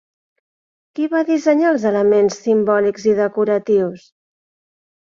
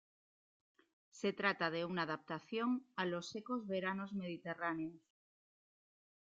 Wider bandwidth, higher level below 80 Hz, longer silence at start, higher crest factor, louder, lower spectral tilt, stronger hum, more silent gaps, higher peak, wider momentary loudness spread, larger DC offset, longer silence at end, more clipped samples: about the same, 7.6 kHz vs 7.8 kHz; first, -62 dBFS vs -84 dBFS; second, 0.95 s vs 1.15 s; second, 14 dB vs 24 dB; first, -16 LUFS vs -41 LUFS; first, -6 dB/octave vs -3.5 dB/octave; neither; neither; first, -2 dBFS vs -20 dBFS; second, 5 LU vs 8 LU; neither; second, 1.05 s vs 1.25 s; neither